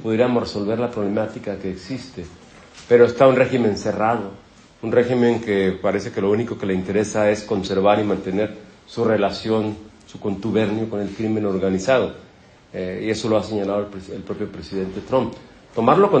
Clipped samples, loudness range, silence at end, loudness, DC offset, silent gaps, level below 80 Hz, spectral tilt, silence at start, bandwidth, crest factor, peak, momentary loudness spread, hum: under 0.1%; 5 LU; 0 s; -21 LUFS; under 0.1%; none; -52 dBFS; -6.5 dB/octave; 0 s; 9 kHz; 20 dB; -2 dBFS; 15 LU; none